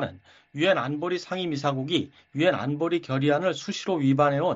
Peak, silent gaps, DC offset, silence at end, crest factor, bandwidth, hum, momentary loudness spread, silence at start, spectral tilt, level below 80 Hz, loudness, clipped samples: -8 dBFS; none; under 0.1%; 0 s; 18 dB; 8 kHz; none; 8 LU; 0 s; -4.5 dB/octave; -66 dBFS; -26 LUFS; under 0.1%